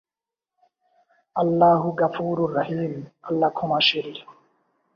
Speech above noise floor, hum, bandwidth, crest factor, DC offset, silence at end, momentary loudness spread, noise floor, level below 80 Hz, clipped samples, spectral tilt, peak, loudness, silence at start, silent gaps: over 68 dB; none; 7 kHz; 18 dB; under 0.1%; 0.65 s; 14 LU; under -90 dBFS; -66 dBFS; under 0.1%; -7 dB/octave; -6 dBFS; -22 LUFS; 1.35 s; none